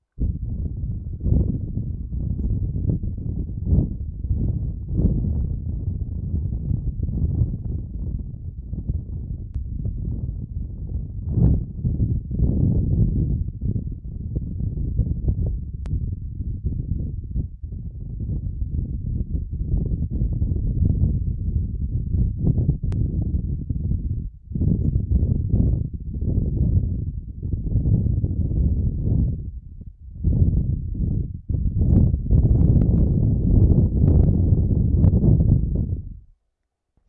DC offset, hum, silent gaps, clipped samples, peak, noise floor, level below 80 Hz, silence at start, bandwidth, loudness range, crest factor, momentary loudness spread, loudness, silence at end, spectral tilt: under 0.1%; none; none; under 0.1%; -4 dBFS; -77 dBFS; -26 dBFS; 0.15 s; 1.3 kHz; 10 LU; 18 dB; 13 LU; -24 LUFS; 0.9 s; -14.5 dB/octave